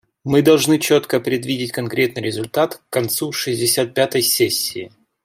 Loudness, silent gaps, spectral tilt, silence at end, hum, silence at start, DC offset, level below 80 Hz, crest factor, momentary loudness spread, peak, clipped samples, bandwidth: -18 LUFS; none; -4 dB/octave; 0.35 s; none; 0.25 s; under 0.1%; -60 dBFS; 18 dB; 9 LU; -2 dBFS; under 0.1%; 16 kHz